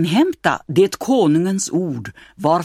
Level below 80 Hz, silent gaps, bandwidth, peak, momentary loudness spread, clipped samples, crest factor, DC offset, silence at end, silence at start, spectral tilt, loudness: -56 dBFS; none; 16 kHz; -2 dBFS; 10 LU; under 0.1%; 16 dB; under 0.1%; 0 s; 0 s; -5.5 dB/octave; -18 LUFS